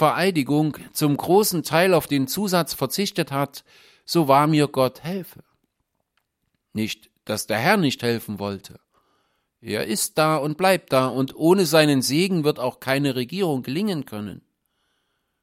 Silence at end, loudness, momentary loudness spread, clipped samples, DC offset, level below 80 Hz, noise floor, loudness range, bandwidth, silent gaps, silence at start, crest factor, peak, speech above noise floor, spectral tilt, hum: 1.05 s; -21 LUFS; 13 LU; under 0.1%; under 0.1%; -62 dBFS; -76 dBFS; 6 LU; 16.5 kHz; none; 0 s; 20 dB; -2 dBFS; 54 dB; -5 dB/octave; none